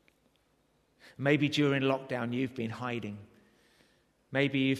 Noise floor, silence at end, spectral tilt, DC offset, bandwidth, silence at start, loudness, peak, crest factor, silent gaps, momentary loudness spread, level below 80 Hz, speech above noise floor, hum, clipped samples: -71 dBFS; 0 s; -6.5 dB/octave; under 0.1%; 13 kHz; 1.05 s; -31 LUFS; -12 dBFS; 22 dB; none; 10 LU; -72 dBFS; 41 dB; none; under 0.1%